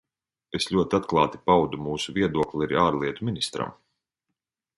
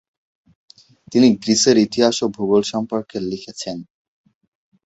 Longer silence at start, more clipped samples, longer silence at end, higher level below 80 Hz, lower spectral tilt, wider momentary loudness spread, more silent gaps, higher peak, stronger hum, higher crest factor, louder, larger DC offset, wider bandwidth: second, 0.55 s vs 1.1 s; neither; about the same, 1.05 s vs 1.05 s; first, -52 dBFS vs -58 dBFS; first, -5.5 dB/octave vs -4 dB/octave; second, 8 LU vs 14 LU; neither; second, -6 dBFS vs -2 dBFS; neither; about the same, 20 dB vs 18 dB; second, -25 LUFS vs -18 LUFS; neither; first, 11.5 kHz vs 8.2 kHz